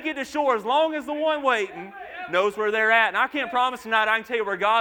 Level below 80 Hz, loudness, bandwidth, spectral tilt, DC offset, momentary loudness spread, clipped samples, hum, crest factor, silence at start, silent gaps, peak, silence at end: -66 dBFS; -23 LUFS; 19.5 kHz; -3 dB/octave; under 0.1%; 8 LU; under 0.1%; none; 18 dB; 0 s; none; -6 dBFS; 0 s